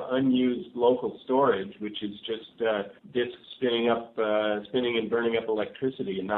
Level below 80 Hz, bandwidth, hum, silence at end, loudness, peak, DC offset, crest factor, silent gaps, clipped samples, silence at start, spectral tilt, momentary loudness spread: -68 dBFS; 4.1 kHz; none; 0 s; -28 LUFS; -10 dBFS; under 0.1%; 18 dB; none; under 0.1%; 0 s; -9 dB/octave; 10 LU